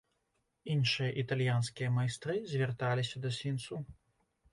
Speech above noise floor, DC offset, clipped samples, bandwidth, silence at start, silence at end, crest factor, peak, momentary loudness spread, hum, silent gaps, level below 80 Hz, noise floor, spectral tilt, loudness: 47 dB; under 0.1%; under 0.1%; 11.5 kHz; 0.65 s; 0.6 s; 16 dB; -20 dBFS; 10 LU; none; none; -66 dBFS; -80 dBFS; -5.5 dB/octave; -34 LUFS